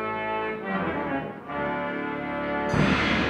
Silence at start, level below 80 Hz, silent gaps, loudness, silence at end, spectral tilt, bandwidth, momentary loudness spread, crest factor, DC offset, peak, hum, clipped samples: 0 s; -46 dBFS; none; -27 LUFS; 0 s; -6 dB/octave; 11 kHz; 8 LU; 18 dB; under 0.1%; -10 dBFS; none; under 0.1%